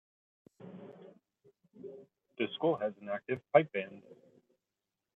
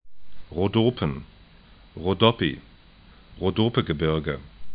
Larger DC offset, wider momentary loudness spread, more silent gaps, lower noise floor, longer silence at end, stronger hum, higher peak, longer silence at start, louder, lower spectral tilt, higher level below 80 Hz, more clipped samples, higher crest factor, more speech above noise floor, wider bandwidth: neither; first, 27 LU vs 15 LU; neither; first, -89 dBFS vs -51 dBFS; first, 1 s vs 0 s; neither; second, -10 dBFS vs -2 dBFS; first, 0.6 s vs 0.05 s; second, -33 LUFS vs -25 LUFS; second, -8 dB/octave vs -11 dB/octave; second, -86 dBFS vs -46 dBFS; neither; about the same, 26 dB vs 24 dB; first, 56 dB vs 27 dB; second, 4 kHz vs 5 kHz